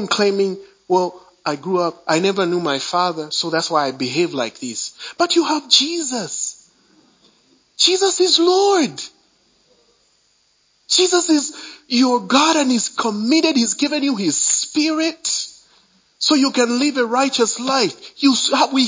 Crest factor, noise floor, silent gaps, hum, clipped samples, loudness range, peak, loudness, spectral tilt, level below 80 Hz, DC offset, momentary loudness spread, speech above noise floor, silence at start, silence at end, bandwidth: 18 dB; -61 dBFS; none; none; under 0.1%; 3 LU; 0 dBFS; -17 LUFS; -2.5 dB/octave; -72 dBFS; under 0.1%; 11 LU; 43 dB; 0 s; 0 s; 7.8 kHz